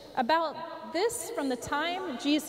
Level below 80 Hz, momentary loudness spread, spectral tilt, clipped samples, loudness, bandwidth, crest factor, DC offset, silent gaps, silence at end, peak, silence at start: -64 dBFS; 7 LU; -2.5 dB/octave; under 0.1%; -31 LUFS; 16 kHz; 16 dB; under 0.1%; none; 0 s; -16 dBFS; 0 s